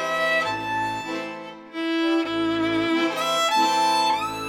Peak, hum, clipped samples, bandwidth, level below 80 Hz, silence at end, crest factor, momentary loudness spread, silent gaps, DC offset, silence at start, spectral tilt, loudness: -10 dBFS; none; under 0.1%; 16.5 kHz; -60 dBFS; 0 s; 14 dB; 11 LU; none; under 0.1%; 0 s; -3 dB/octave; -23 LUFS